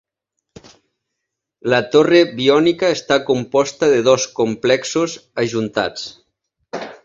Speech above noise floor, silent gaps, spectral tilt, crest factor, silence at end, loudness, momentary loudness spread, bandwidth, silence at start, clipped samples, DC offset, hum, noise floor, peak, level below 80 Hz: 63 dB; none; -4.5 dB/octave; 18 dB; 0.1 s; -16 LUFS; 14 LU; 7.8 kHz; 1.65 s; under 0.1%; under 0.1%; none; -79 dBFS; 0 dBFS; -58 dBFS